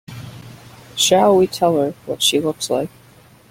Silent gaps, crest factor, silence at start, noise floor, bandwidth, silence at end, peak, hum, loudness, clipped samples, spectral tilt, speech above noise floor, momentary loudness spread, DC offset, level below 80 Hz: none; 18 dB; 0.1 s; -47 dBFS; 16.5 kHz; 0.65 s; -2 dBFS; none; -17 LUFS; under 0.1%; -3.5 dB/octave; 31 dB; 20 LU; under 0.1%; -56 dBFS